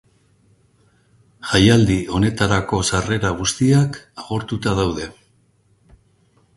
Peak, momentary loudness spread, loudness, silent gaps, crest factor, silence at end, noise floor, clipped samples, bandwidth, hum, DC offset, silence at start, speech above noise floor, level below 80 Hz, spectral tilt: 0 dBFS; 14 LU; -18 LUFS; none; 20 dB; 1.45 s; -59 dBFS; under 0.1%; 11.5 kHz; none; under 0.1%; 1.45 s; 41 dB; -38 dBFS; -5 dB/octave